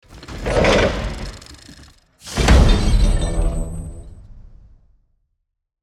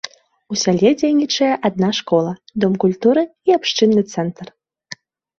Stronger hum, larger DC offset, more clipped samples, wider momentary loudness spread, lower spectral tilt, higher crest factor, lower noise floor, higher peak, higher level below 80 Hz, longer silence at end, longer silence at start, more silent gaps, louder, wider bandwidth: neither; neither; neither; first, 25 LU vs 19 LU; about the same, -5.5 dB/octave vs -5 dB/octave; about the same, 18 dB vs 16 dB; first, -72 dBFS vs -40 dBFS; about the same, -2 dBFS vs -2 dBFS; first, -22 dBFS vs -58 dBFS; first, 1.4 s vs 0.45 s; about the same, 0.1 s vs 0.05 s; neither; about the same, -18 LUFS vs -17 LUFS; first, 12.5 kHz vs 7.6 kHz